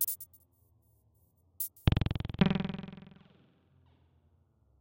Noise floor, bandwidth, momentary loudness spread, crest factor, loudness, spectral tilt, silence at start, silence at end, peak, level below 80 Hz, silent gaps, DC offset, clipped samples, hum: -69 dBFS; 16.5 kHz; 21 LU; 28 dB; -33 LUFS; -5.5 dB/octave; 0 s; 1.85 s; -8 dBFS; -48 dBFS; none; under 0.1%; under 0.1%; none